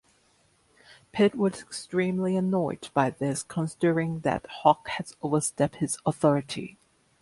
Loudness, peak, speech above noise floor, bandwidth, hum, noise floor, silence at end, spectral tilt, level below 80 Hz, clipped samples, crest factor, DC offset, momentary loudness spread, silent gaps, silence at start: -27 LUFS; -6 dBFS; 39 dB; 11.5 kHz; none; -65 dBFS; 0.5 s; -5.5 dB/octave; -62 dBFS; under 0.1%; 22 dB; under 0.1%; 9 LU; none; 0.9 s